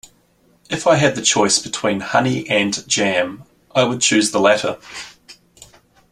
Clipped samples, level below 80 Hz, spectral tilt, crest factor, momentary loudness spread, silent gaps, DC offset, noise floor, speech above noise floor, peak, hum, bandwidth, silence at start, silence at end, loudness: under 0.1%; -56 dBFS; -3 dB/octave; 18 dB; 12 LU; none; under 0.1%; -57 dBFS; 40 dB; 0 dBFS; none; 14.5 kHz; 0.7 s; 0.45 s; -17 LUFS